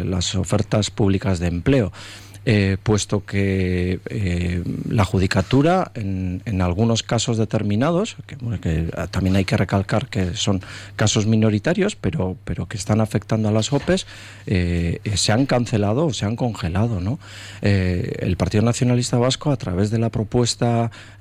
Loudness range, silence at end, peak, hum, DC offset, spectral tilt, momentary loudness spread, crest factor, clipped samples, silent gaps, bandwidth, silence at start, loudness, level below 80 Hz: 2 LU; 0.05 s; -6 dBFS; none; under 0.1%; -5.5 dB/octave; 7 LU; 14 dB; under 0.1%; none; 13 kHz; 0 s; -21 LUFS; -34 dBFS